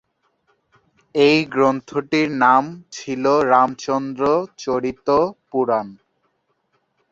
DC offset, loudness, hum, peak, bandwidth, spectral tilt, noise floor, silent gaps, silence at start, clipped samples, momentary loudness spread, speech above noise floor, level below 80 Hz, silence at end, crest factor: under 0.1%; -19 LUFS; none; -2 dBFS; 7.8 kHz; -5.5 dB/octave; -68 dBFS; none; 1.15 s; under 0.1%; 10 LU; 50 dB; -58 dBFS; 1.15 s; 18 dB